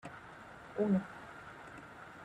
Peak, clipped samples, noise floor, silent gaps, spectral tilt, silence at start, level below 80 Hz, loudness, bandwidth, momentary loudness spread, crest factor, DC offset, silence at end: -22 dBFS; under 0.1%; -53 dBFS; none; -8 dB/octave; 0.05 s; -70 dBFS; -37 LUFS; 10 kHz; 18 LU; 18 dB; under 0.1%; 0 s